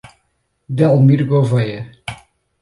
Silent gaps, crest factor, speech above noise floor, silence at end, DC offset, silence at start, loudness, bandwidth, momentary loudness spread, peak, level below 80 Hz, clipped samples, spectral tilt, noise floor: none; 14 dB; 53 dB; 0.45 s; under 0.1%; 0.7 s; -15 LUFS; 11.5 kHz; 19 LU; -2 dBFS; -52 dBFS; under 0.1%; -9 dB/octave; -66 dBFS